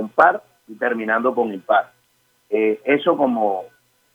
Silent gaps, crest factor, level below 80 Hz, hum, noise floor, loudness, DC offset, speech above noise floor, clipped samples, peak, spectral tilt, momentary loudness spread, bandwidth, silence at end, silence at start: none; 20 dB; -74 dBFS; none; -63 dBFS; -20 LUFS; under 0.1%; 44 dB; under 0.1%; -2 dBFS; -6.5 dB/octave; 9 LU; 11.5 kHz; 0.45 s; 0 s